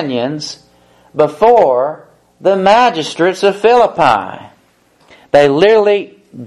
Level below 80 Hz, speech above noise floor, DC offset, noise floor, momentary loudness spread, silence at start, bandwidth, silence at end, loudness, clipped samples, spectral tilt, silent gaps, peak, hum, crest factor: -52 dBFS; 41 dB; under 0.1%; -52 dBFS; 17 LU; 0 s; 12 kHz; 0 s; -11 LUFS; under 0.1%; -5 dB/octave; none; 0 dBFS; none; 12 dB